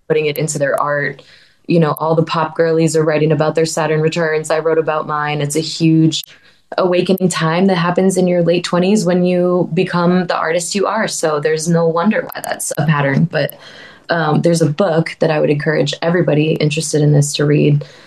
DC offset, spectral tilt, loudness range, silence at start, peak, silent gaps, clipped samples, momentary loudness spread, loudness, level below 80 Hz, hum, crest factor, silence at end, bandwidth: 0.1%; -5.5 dB/octave; 2 LU; 0.1 s; 0 dBFS; none; under 0.1%; 4 LU; -15 LUFS; -60 dBFS; none; 14 dB; 0.2 s; 13.5 kHz